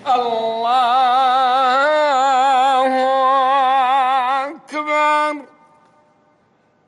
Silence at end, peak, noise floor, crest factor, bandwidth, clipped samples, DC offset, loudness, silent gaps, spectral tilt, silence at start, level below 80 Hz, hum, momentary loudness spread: 1.4 s; -6 dBFS; -58 dBFS; 10 dB; 11.5 kHz; under 0.1%; under 0.1%; -15 LUFS; none; -2 dB/octave; 0.05 s; -72 dBFS; none; 6 LU